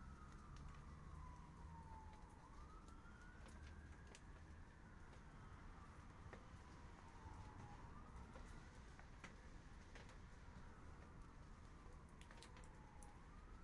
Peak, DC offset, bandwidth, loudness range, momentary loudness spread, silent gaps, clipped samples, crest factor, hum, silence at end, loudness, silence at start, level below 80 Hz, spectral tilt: -42 dBFS; under 0.1%; 11 kHz; 2 LU; 4 LU; none; under 0.1%; 18 dB; none; 0 s; -62 LUFS; 0 s; -62 dBFS; -5.5 dB/octave